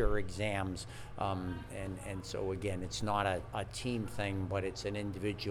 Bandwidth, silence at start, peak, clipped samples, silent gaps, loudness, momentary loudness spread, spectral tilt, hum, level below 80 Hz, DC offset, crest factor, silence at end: 14.5 kHz; 0 s; -18 dBFS; under 0.1%; none; -38 LUFS; 8 LU; -5.5 dB/octave; none; -48 dBFS; under 0.1%; 18 dB; 0 s